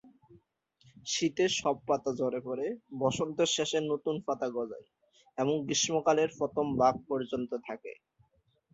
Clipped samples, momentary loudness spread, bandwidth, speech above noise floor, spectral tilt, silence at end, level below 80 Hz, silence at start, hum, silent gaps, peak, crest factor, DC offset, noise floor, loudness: under 0.1%; 12 LU; 8.2 kHz; 40 dB; -3.5 dB/octave; 0.8 s; -68 dBFS; 0.05 s; none; none; -12 dBFS; 20 dB; under 0.1%; -71 dBFS; -31 LUFS